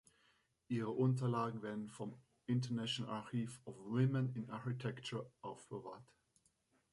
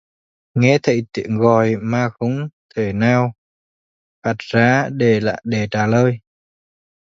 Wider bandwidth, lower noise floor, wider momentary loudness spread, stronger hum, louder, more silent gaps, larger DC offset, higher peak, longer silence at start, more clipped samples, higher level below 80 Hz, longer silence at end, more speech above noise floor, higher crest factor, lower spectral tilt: first, 11.5 kHz vs 7.6 kHz; second, -79 dBFS vs under -90 dBFS; first, 14 LU vs 10 LU; neither; second, -41 LUFS vs -18 LUFS; second, none vs 2.53-2.69 s, 3.38-4.22 s; neither; second, -22 dBFS vs 0 dBFS; first, 0.7 s vs 0.55 s; neither; second, -78 dBFS vs -52 dBFS; about the same, 0.9 s vs 0.95 s; second, 38 dB vs over 74 dB; about the same, 18 dB vs 18 dB; about the same, -7 dB/octave vs -7 dB/octave